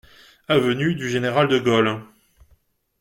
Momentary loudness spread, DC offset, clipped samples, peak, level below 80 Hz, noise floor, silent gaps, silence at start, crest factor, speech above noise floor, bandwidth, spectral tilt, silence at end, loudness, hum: 5 LU; under 0.1%; under 0.1%; -4 dBFS; -56 dBFS; -61 dBFS; none; 0.5 s; 18 dB; 41 dB; 16.5 kHz; -6 dB/octave; 0.95 s; -20 LUFS; none